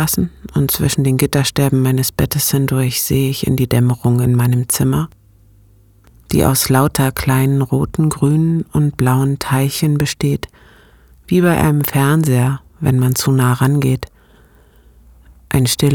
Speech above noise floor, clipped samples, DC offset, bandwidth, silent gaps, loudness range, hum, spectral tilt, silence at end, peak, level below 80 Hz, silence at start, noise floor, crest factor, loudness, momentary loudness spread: 34 dB; under 0.1%; under 0.1%; 19.5 kHz; none; 2 LU; none; -5.5 dB/octave; 0 s; 0 dBFS; -38 dBFS; 0 s; -48 dBFS; 16 dB; -15 LUFS; 6 LU